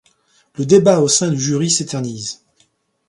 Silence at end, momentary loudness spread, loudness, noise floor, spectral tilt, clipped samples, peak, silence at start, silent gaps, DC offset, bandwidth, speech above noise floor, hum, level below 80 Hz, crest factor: 0.75 s; 16 LU; -15 LUFS; -61 dBFS; -4.5 dB/octave; under 0.1%; 0 dBFS; 0.6 s; none; under 0.1%; 11.5 kHz; 45 dB; none; -58 dBFS; 18 dB